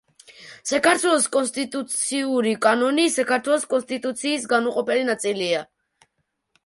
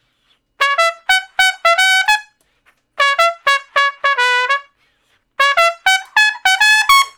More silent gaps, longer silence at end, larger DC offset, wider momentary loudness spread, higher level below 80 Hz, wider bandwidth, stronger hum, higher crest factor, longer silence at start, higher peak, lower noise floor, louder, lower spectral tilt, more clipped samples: neither; first, 1 s vs 0.1 s; neither; about the same, 7 LU vs 6 LU; second, -70 dBFS vs -56 dBFS; second, 11.5 kHz vs over 20 kHz; neither; about the same, 18 dB vs 16 dB; second, 0.3 s vs 0.6 s; second, -4 dBFS vs 0 dBFS; first, -74 dBFS vs -61 dBFS; second, -21 LUFS vs -13 LUFS; first, -2 dB/octave vs 3.5 dB/octave; second, under 0.1% vs 0.5%